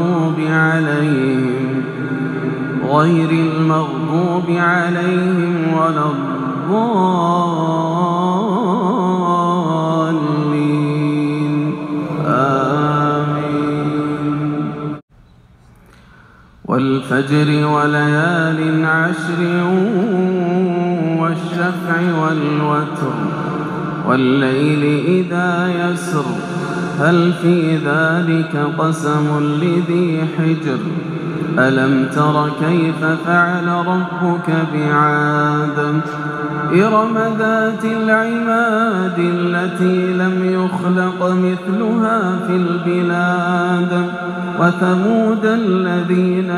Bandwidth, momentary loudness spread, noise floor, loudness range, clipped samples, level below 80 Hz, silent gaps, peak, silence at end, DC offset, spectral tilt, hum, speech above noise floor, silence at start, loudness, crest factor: 11 kHz; 6 LU; -46 dBFS; 2 LU; under 0.1%; -56 dBFS; 15.02-15.08 s; -2 dBFS; 0 s; under 0.1%; -7.5 dB/octave; none; 31 dB; 0 s; -16 LUFS; 14 dB